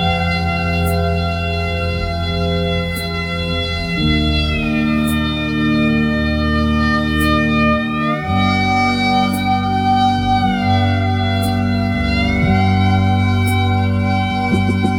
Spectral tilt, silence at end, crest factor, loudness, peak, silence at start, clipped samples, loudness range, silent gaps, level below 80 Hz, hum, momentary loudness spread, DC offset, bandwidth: -6.5 dB/octave; 0 s; 12 dB; -16 LUFS; -4 dBFS; 0 s; under 0.1%; 3 LU; none; -28 dBFS; none; 5 LU; under 0.1%; 17 kHz